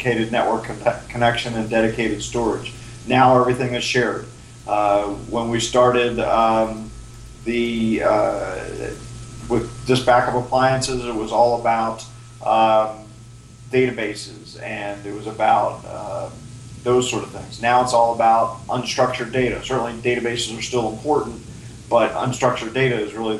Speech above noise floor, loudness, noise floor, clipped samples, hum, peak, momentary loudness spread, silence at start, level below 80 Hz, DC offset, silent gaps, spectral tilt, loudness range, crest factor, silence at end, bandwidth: 22 dB; -20 LUFS; -41 dBFS; under 0.1%; none; -2 dBFS; 16 LU; 0 s; -44 dBFS; under 0.1%; none; -5 dB/octave; 4 LU; 18 dB; 0 s; 12.5 kHz